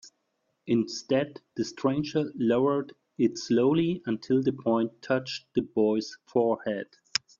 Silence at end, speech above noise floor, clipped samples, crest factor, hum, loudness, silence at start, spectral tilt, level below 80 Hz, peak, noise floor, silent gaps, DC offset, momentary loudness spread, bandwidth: 0.55 s; 50 dB; under 0.1%; 22 dB; none; -28 LUFS; 0.05 s; -5.5 dB/octave; -66 dBFS; -6 dBFS; -77 dBFS; none; under 0.1%; 8 LU; 7.4 kHz